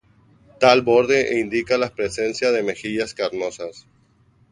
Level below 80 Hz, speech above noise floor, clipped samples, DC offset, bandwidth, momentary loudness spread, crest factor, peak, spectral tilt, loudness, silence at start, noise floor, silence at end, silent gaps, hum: -56 dBFS; 38 dB; under 0.1%; under 0.1%; 11 kHz; 11 LU; 20 dB; 0 dBFS; -4 dB/octave; -20 LUFS; 0.6 s; -58 dBFS; 0.7 s; none; none